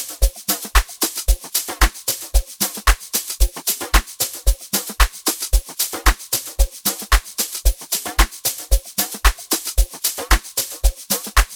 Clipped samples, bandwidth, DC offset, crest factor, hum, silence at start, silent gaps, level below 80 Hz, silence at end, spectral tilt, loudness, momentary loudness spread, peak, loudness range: under 0.1%; over 20 kHz; 0.1%; 18 dB; none; 0 s; none; -20 dBFS; 0 s; -2 dB/octave; -20 LUFS; 4 LU; 0 dBFS; 1 LU